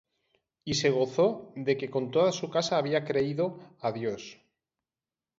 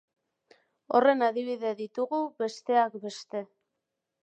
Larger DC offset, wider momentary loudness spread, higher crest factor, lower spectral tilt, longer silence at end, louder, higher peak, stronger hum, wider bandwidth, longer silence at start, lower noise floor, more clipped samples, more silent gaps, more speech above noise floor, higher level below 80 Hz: neither; second, 9 LU vs 14 LU; about the same, 18 dB vs 20 dB; about the same, -5 dB/octave vs -4.5 dB/octave; first, 1.05 s vs 0.8 s; about the same, -29 LUFS vs -28 LUFS; about the same, -12 dBFS vs -10 dBFS; neither; second, 7.8 kHz vs 9 kHz; second, 0.65 s vs 0.9 s; first, under -90 dBFS vs -84 dBFS; neither; neither; first, over 62 dB vs 57 dB; first, -68 dBFS vs -88 dBFS